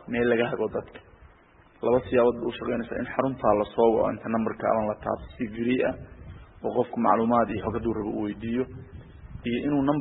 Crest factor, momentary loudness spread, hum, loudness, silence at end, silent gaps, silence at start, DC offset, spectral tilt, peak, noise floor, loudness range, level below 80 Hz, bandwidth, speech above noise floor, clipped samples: 20 dB; 14 LU; none; -26 LUFS; 0 s; none; 0 s; under 0.1%; -11 dB/octave; -6 dBFS; -56 dBFS; 2 LU; -50 dBFS; 4 kHz; 30 dB; under 0.1%